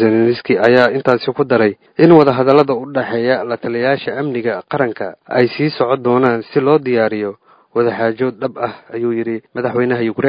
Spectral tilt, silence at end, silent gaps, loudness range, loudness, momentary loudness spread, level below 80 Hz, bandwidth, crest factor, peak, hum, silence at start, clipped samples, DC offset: -8.5 dB/octave; 0 s; none; 5 LU; -15 LUFS; 10 LU; -58 dBFS; 6.2 kHz; 14 dB; 0 dBFS; none; 0 s; 0.1%; under 0.1%